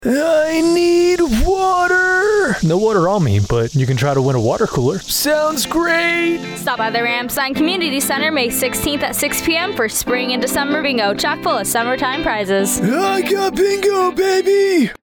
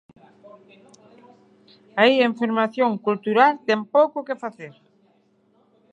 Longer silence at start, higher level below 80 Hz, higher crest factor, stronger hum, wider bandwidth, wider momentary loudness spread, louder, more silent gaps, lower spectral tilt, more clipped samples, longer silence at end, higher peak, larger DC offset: second, 0 s vs 1.95 s; first, -34 dBFS vs -80 dBFS; second, 10 dB vs 22 dB; neither; first, over 20 kHz vs 8 kHz; second, 4 LU vs 14 LU; first, -16 LUFS vs -20 LUFS; neither; second, -4.5 dB/octave vs -6 dB/octave; neither; second, 0.05 s vs 1.25 s; second, -6 dBFS vs -2 dBFS; neither